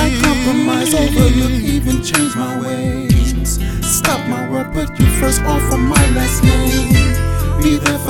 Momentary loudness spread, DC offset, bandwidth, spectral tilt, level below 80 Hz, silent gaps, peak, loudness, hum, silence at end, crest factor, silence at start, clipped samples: 7 LU; under 0.1%; 18 kHz; -5 dB/octave; -20 dBFS; none; 0 dBFS; -14 LUFS; none; 0 s; 14 dB; 0 s; under 0.1%